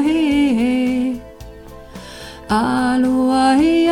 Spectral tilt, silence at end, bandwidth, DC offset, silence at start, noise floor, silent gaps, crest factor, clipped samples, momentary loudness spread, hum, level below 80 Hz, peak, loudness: -5 dB/octave; 0 s; 14.5 kHz; under 0.1%; 0 s; -36 dBFS; none; 12 dB; under 0.1%; 21 LU; none; -42 dBFS; -4 dBFS; -16 LUFS